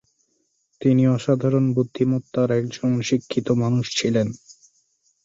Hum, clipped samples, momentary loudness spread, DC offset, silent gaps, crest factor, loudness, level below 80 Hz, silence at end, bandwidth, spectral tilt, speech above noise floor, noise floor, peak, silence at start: none; under 0.1%; 5 LU; under 0.1%; none; 16 dB; -21 LUFS; -60 dBFS; 0.7 s; 7.8 kHz; -6.5 dB/octave; 49 dB; -69 dBFS; -6 dBFS; 0.8 s